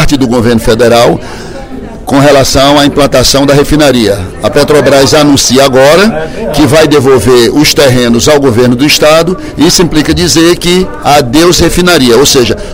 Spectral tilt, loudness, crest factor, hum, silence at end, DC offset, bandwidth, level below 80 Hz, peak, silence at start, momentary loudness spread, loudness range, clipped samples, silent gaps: -4 dB/octave; -5 LUFS; 4 dB; none; 0 s; under 0.1%; over 20 kHz; -22 dBFS; 0 dBFS; 0 s; 7 LU; 2 LU; 8%; none